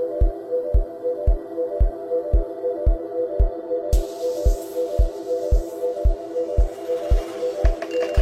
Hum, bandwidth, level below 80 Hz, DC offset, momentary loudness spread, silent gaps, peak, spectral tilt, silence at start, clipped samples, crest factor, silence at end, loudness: none; 13.5 kHz; -22 dBFS; under 0.1%; 3 LU; none; -4 dBFS; -7.5 dB/octave; 0 s; under 0.1%; 16 dB; 0 s; -24 LUFS